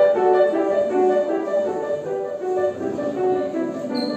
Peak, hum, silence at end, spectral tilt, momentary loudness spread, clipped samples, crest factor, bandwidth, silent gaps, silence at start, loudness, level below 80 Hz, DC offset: -6 dBFS; none; 0 s; -6 dB/octave; 8 LU; under 0.1%; 14 dB; 8.8 kHz; none; 0 s; -21 LUFS; -62 dBFS; under 0.1%